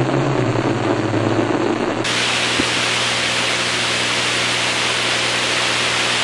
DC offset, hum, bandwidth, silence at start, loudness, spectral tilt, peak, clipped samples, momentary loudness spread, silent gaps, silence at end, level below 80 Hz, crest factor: under 0.1%; none; 11.5 kHz; 0 s; -17 LUFS; -3 dB/octave; -4 dBFS; under 0.1%; 3 LU; none; 0 s; -46 dBFS; 14 dB